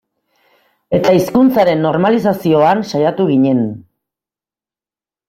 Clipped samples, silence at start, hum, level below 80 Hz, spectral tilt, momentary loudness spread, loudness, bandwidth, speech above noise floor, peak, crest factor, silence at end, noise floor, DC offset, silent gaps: under 0.1%; 0.9 s; none; -54 dBFS; -7 dB/octave; 6 LU; -13 LUFS; 16 kHz; over 78 dB; -2 dBFS; 14 dB; 1.5 s; under -90 dBFS; under 0.1%; none